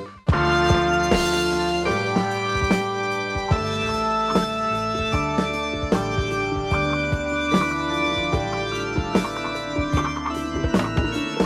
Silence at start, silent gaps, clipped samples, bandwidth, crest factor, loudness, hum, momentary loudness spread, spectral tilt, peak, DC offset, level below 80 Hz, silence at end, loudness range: 0 s; none; under 0.1%; 16 kHz; 18 dB; -22 LUFS; none; 6 LU; -5.5 dB/octave; -4 dBFS; under 0.1%; -34 dBFS; 0 s; 3 LU